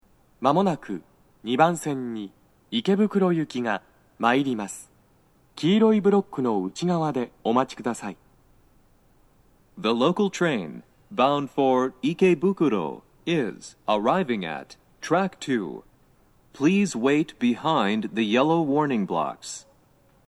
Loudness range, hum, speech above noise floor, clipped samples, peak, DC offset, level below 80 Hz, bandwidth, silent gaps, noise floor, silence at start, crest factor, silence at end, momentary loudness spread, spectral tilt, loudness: 5 LU; none; 37 dB; under 0.1%; -4 dBFS; under 0.1%; -64 dBFS; 12.5 kHz; none; -60 dBFS; 0.4 s; 20 dB; 0.65 s; 14 LU; -6 dB/octave; -24 LUFS